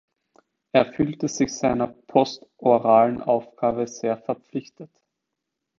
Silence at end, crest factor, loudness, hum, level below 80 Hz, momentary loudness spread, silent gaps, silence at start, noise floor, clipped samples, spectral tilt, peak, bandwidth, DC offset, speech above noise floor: 0.95 s; 22 dB; -23 LUFS; none; -58 dBFS; 11 LU; none; 0.75 s; -82 dBFS; under 0.1%; -5.5 dB/octave; -2 dBFS; 7.6 kHz; under 0.1%; 60 dB